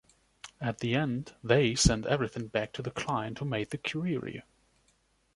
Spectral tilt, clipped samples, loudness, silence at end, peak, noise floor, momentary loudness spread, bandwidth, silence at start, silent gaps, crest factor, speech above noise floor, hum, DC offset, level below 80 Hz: -4.5 dB/octave; under 0.1%; -31 LUFS; 0.95 s; -8 dBFS; -70 dBFS; 11 LU; 11.5 kHz; 0.45 s; none; 24 dB; 40 dB; none; under 0.1%; -46 dBFS